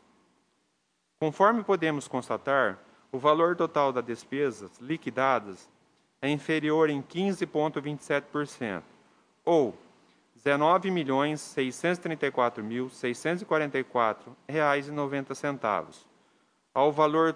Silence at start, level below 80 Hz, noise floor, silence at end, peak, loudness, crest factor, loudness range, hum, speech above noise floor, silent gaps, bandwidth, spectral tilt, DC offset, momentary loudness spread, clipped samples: 1.2 s; -78 dBFS; -75 dBFS; 0 s; -8 dBFS; -28 LUFS; 22 dB; 3 LU; none; 47 dB; none; 10.5 kHz; -5.5 dB/octave; under 0.1%; 11 LU; under 0.1%